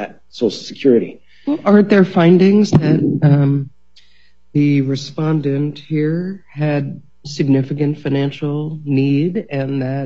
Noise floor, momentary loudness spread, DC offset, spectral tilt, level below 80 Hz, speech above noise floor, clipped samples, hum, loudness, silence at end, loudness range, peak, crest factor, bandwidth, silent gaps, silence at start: -56 dBFS; 12 LU; 0.7%; -8 dB/octave; -54 dBFS; 41 dB; under 0.1%; none; -16 LUFS; 0 s; 6 LU; 0 dBFS; 16 dB; 7.6 kHz; none; 0 s